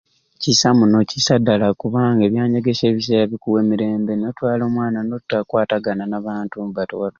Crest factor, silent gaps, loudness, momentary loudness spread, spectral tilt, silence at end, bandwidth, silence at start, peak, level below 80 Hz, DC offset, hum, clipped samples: 16 dB; none; -18 LUFS; 10 LU; -5 dB/octave; 0.1 s; 7.4 kHz; 0.4 s; -2 dBFS; -54 dBFS; under 0.1%; none; under 0.1%